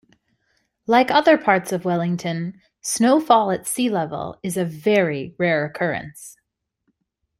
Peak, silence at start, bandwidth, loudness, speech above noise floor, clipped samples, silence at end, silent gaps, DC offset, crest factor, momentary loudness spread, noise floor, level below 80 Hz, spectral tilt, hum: -2 dBFS; 0.9 s; 16 kHz; -20 LUFS; 53 dB; under 0.1%; 1.1 s; none; under 0.1%; 20 dB; 14 LU; -72 dBFS; -62 dBFS; -4.5 dB/octave; none